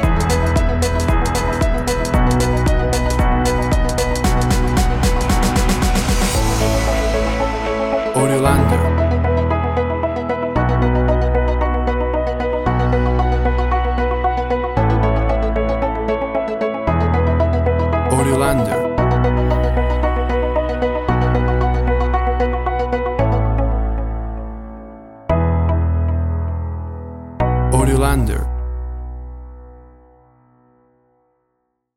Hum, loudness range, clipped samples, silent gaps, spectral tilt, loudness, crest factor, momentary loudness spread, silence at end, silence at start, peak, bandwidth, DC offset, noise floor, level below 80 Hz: none; 4 LU; under 0.1%; none; -6 dB/octave; -18 LUFS; 16 dB; 7 LU; 2.15 s; 0 s; -2 dBFS; 16 kHz; under 0.1%; -70 dBFS; -20 dBFS